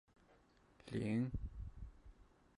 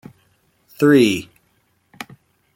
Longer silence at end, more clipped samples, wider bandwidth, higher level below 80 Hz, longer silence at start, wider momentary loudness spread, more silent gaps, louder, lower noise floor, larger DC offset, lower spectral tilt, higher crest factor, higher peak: second, 0.35 s vs 1.3 s; neither; second, 11.5 kHz vs 16.5 kHz; about the same, -56 dBFS vs -60 dBFS; second, 0.3 s vs 0.8 s; second, 19 LU vs 24 LU; neither; second, -44 LUFS vs -16 LUFS; first, -70 dBFS vs -63 dBFS; neither; first, -8 dB/octave vs -5.5 dB/octave; about the same, 16 dB vs 18 dB; second, -30 dBFS vs -2 dBFS